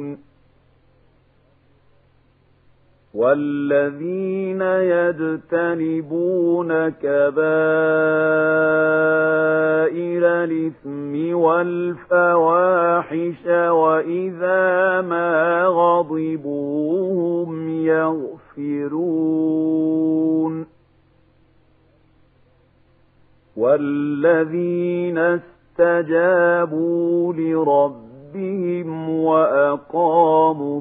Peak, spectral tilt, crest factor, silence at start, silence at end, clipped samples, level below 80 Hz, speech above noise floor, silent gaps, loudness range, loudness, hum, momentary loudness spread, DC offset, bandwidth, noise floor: -2 dBFS; -11.5 dB/octave; 16 dB; 0 s; 0 s; under 0.1%; -66 dBFS; 39 dB; none; 6 LU; -19 LUFS; none; 9 LU; under 0.1%; 3.9 kHz; -57 dBFS